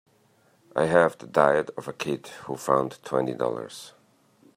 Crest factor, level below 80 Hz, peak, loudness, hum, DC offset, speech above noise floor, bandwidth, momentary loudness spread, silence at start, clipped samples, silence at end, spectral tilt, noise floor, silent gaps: 24 dB; -68 dBFS; -4 dBFS; -25 LUFS; none; under 0.1%; 38 dB; 15.5 kHz; 15 LU; 0.75 s; under 0.1%; 0.7 s; -5.5 dB/octave; -63 dBFS; none